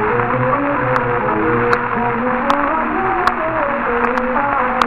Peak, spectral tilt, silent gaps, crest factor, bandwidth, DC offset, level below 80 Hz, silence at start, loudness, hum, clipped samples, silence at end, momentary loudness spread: 0 dBFS; -7 dB/octave; none; 16 dB; 12 kHz; under 0.1%; -38 dBFS; 0 s; -16 LUFS; none; under 0.1%; 0 s; 2 LU